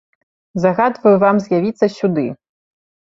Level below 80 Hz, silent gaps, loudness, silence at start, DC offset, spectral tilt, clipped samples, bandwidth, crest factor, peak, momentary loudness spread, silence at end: -60 dBFS; none; -16 LUFS; 0.55 s; under 0.1%; -8 dB/octave; under 0.1%; 7.6 kHz; 16 dB; 0 dBFS; 9 LU; 0.8 s